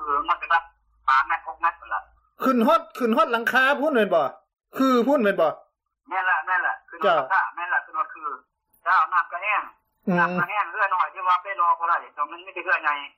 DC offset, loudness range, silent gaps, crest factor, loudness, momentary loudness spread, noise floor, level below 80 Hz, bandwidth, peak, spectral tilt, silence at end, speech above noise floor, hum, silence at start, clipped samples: under 0.1%; 3 LU; none; 14 dB; -23 LUFS; 11 LU; -55 dBFS; -66 dBFS; 15.5 kHz; -8 dBFS; -5.5 dB/octave; 0.1 s; 34 dB; none; 0 s; under 0.1%